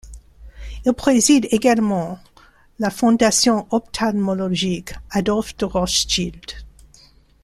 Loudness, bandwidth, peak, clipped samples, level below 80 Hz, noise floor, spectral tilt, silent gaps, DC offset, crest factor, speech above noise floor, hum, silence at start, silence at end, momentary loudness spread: -19 LUFS; 15 kHz; -2 dBFS; under 0.1%; -40 dBFS; -51 dBFS; -4 dB/octave; none; under 0.1%; 18 dB; 33 dB; none; 0.05 s; 0.75 s; 16 LU